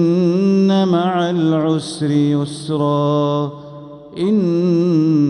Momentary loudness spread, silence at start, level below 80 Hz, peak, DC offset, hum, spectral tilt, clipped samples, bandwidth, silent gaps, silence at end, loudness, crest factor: 9 LU; 0 s; -60 dBFS; -4 dBFS; under 0.1%; none; -7.5 dB/octave; under 0.1%; 11 kHz; none; 0 s; -16 LUFS; 12 dB